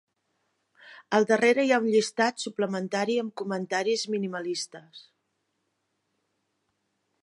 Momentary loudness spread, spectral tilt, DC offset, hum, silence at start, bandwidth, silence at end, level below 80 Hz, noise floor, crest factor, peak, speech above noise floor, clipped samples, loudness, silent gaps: 11 LU; -4 dB/octave; under 0.1%; none; 0.85 s; 11.5 kHz; 2.2 s; -82 dBFS; -78 dBFS; 20 dB; -8 dBFS; 51 dB; under 0.1%; -26 LUFS; none